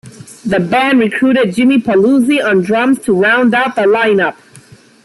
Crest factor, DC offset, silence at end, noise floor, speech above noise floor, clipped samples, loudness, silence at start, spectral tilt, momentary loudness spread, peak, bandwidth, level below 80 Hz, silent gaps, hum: 10 dB; under 0.1%; 0.7 s; -41 dBFS; 30 dB; under 0.1%; -11 LUFS; 0.05 s; -6 dB/octave; 4 LU; -2 dBFS; 12 kHz; -52 dBFS; none; none